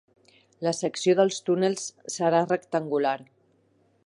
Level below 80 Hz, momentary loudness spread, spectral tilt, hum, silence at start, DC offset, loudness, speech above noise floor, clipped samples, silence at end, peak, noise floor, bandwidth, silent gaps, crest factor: -78 dBFS; 9 LU; -4.5 dB/octave; none; 0.6 s; under 0.1%; -26 LUFS; 40 dB; under 0.1%; 0.8 s; -8 dBFS; -65 dBFS; 11.5 kHz; none; 18 dB